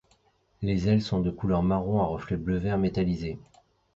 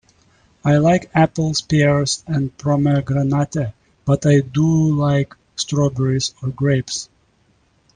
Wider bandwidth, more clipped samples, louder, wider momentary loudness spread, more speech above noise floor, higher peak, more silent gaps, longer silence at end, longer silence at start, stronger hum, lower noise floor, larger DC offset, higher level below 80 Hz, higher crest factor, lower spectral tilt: second, 7.6 kHz vs 9.6 kHz; neither; second, -27 LUFS vs -18 LUFS; about the same, 8 LU vs 10 LU; about the same, 40 dB vs 42 dB; second, -10 dBFS vs 0 dBFS; neither; second, 0.6 s vs 0.9 s; about the same, 0.6 s vs 0.65 s; neither; first, -66 dBFS vs -59 dBFS; neither; about the same, -44 dBFS vs -46 dBFS; about the same, 16 dB vs 18 dB; first, -8.5 dB/octave vs -6 dB/octave